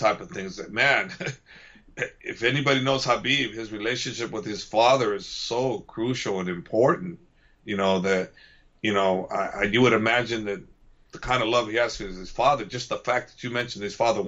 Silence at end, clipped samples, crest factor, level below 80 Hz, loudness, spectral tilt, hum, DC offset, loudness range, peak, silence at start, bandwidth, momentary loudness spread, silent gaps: 0 s; under 0.1%; 18 dB; -52 dBFS; -25 LUFS; -4.5 dB/octave; none; under 0.1%; 2 LU; -8 dBFS; 0 s; 8 kHz; 13 LU; none